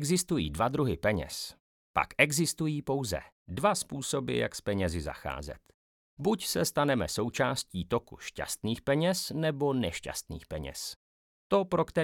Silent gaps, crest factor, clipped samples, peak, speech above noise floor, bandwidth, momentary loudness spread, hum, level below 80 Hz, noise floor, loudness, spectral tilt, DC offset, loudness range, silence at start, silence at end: 1.60-1.94 s, 3.32-3.46 s, 5.74-6.17 s, 10.96-11.50 s; 24 dB; under 0.1%; -8 dBFS; over 59 dB; 19 kHz; 11 LU; none; -54 dBFS; under -90 dBFS; -31 LUFS; -4.5 dB/octave; under 0.1%; 3 LU; 0 s; 0 s